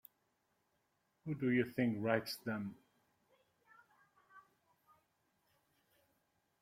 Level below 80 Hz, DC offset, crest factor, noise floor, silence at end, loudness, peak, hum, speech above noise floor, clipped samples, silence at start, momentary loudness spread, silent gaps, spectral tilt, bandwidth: -80 dBFS; under 0.1%; 24 dB; -82 dBFS; 2.2 s; -38 LUFS; -20 dBFS; none; 44 dB; under 0.1%; 1.25 s; 12 LU; none; -6.5 dB/octave; 16 kHz